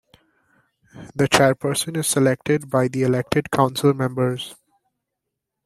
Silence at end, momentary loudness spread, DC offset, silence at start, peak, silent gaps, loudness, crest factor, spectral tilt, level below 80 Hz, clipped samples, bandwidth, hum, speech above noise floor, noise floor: 1.1 s; 7 LU; under 0.1%; 0.95 s; -2 dBFS; none; -20 LUFS; 20 dB; -5 dB/octave; -56 dBFS; under 0.1%; 15.5 kHz; none; 61 dB; -81 dBFS